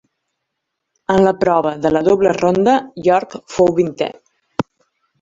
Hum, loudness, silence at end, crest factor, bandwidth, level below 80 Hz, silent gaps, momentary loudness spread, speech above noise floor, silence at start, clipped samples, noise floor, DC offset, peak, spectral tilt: none; -16 LUFS; 0.6 s; 16 dB; 7.8 kHz; -50 dBFS; none; 12 LU; 62 dB; 1.1 s; under 0.1%; -76 dBFS; under 0.1%; 0 dBFS; -6.5 dB/octave